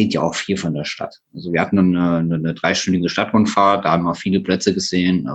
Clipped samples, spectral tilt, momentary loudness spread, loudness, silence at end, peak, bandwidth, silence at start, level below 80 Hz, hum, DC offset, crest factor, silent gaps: under 0.1%; -5.5 dB/octave; 8 LU; -18 LUFS; 0 s; 0 dBFS; 8.6 kHz; 0 s; -52 dBFS; none; under 0.1%; 16 dB; none